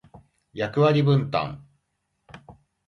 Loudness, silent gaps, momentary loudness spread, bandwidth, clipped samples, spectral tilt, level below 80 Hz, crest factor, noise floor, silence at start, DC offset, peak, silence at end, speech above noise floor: -23 LUFS; none; 20 LU; 6.4 kHz; under 0.1%; -8.5 dB/octave; -58 dBFS; 18 dB; -75 dBFS; 0.15 s; under 0.1%; -8 dBFS; 0.35 s; 54 dB